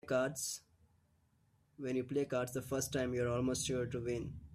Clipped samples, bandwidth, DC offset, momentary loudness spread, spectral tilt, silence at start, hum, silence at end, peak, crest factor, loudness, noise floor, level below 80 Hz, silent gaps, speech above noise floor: under 0.1%; 15.5 kHz; under 0.1%; 6 LU; -4.5 dB/octave; 0.05 s; none; 0 s; -24 dBFS; 16 dB; -38 LUFS; -74 dBFS; -62 dBFS; none; 36 dB